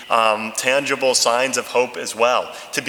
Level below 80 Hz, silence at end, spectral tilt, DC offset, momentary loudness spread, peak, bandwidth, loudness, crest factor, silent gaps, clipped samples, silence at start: -70 dBFS; 0 s; -1 dB/octave; under 0.1%; 6 LU; 0 dBFS; 19 kHz; -18 LUFS; 18 dB; none; under 0.1%; 0 s